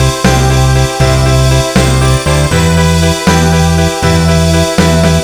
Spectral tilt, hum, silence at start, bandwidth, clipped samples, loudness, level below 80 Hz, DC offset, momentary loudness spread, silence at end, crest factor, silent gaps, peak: -5 dB/octave; none; 0 s; 18.5 kHz; 0.2%; -9 LUFS; -16 dBFS; 1%; 1 LU; 0 s; 8 dB; none; 0 dBFS